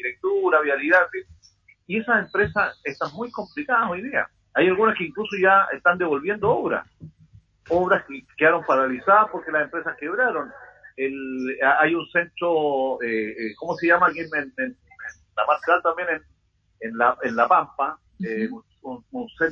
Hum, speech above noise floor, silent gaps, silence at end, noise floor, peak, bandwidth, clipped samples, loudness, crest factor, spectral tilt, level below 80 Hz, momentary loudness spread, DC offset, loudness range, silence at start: none; 35 dB; none; 0 s; -57 dBFS; -4 dBFS; 7.2 kHz; under 0.1%; -22 LUFS; 18 dB; -6.5 dB/octave; -58 dBFS; 13 LU; under 0.1%; 3 LU; 0 s